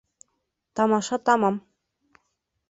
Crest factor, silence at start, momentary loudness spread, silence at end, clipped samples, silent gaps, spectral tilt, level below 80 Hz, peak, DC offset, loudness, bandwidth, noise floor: 20 dB; 0.75 s; 13 LU; 1.1 s; under 0.1%; none; -5 dB/octave; -68 dBFS; -6 dBFS; under 0.1%; -23 LUFS; 8 kHz; -77 dBFS